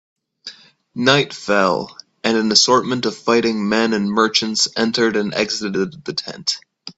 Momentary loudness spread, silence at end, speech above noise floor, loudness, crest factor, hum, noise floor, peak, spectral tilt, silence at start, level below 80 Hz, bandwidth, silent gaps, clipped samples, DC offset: 13 LU; 0.05 s; 22 dB; -17 LUFS; 18 dB; none; -40 dBFS; 0 dBFS; -3 dB/octave; 0.45 s; -60 dBFS; 8.2 kHz; none; under 0.1%; under 0.1%